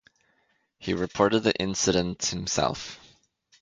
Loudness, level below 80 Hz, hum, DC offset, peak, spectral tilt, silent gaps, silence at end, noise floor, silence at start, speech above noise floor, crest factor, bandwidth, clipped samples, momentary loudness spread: -26 LUFS; -52 dBFS; none; under 0.1%; -6 dBFS; -3.5 dB/octave; none; 0.65 s; -70 dBFS; 0.8 s; 44 dB; 22 dB; 9.6 kHz; under 0.1%; 15 LU